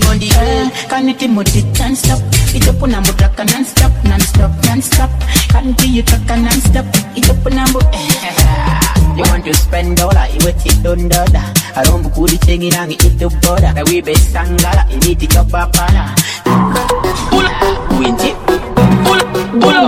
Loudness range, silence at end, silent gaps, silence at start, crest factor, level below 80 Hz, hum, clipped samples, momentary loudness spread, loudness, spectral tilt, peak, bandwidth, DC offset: 1 LU; 0 s; none; 0 s; 10 dB; -14 dBFS; none; 0.6%; 3 LU; -11 LUFS; -4.5 dB/octave; 0 dBFS; 17 kHz; 0.2%